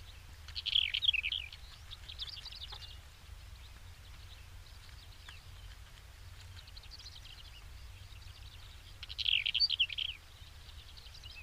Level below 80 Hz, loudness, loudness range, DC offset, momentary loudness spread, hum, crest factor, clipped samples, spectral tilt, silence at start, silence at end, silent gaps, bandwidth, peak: -54 dBFS; -33 LUFS; 18 LU; under 0.1%; 24 LU; none; 26 dB; under 0.1%; -1 dB/octave; 0 s; 0 s; none; 15.5 kHz; -16 dBFS